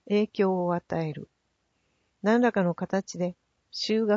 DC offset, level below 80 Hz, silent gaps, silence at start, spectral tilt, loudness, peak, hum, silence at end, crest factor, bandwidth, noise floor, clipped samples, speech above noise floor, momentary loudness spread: under 0.1%; -68 dBFS; none; 0.05 s; -6 dB/octave; -27 LUFS; -12 dBFS; none; 0 s; 16 dB; 7.8 kHz; -75 dBFS; under 0.1%; 49 dB; 10 LU